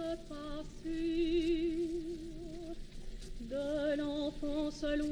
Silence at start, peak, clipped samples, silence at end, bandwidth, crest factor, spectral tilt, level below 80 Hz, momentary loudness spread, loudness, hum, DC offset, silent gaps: 0 s; -24 dBFS; under 0.1%; 0 s; 11 kHz; 14 dB; -5.5 dB/octave; -48 dBFS; 15 LU; -37 LUFS; none; under 0.1%; none